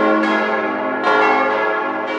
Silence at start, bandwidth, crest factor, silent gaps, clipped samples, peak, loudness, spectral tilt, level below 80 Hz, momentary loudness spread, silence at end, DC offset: 0 s; 8.8 kHz; 16 dB; none; under 0.1%; -2 dBFS; -17 LUFS; -5 dB/octave; -74 dBFS; 6 LU; 0 s; under 0.1%